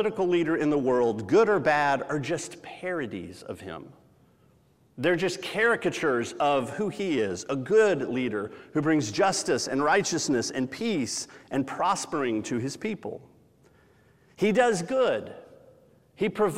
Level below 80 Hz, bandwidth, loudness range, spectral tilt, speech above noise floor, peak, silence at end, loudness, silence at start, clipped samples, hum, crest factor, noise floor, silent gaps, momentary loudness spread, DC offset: -66 dBFS; 15 kHz; 6 LU; -4.5 dB/octave; 36 dB; -10 dBFS; 0 s; -26 LUFS; 0 s; under 0.1%; none; 18 dB; -62 dBFS; none; 12 LU; under 0.1%